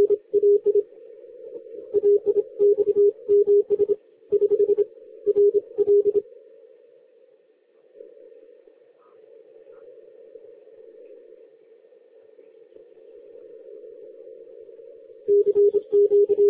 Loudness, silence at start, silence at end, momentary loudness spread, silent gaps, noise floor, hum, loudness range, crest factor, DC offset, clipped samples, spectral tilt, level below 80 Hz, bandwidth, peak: -21 LUFS; 0 s; 0 s; 25 LU; none; -59 dBFS; none; 7 LU; 12 dB; under 0.1%; under 0.1%; -11 dB/octave; -72 dBFS; 1.3 kHz; -12 dBFS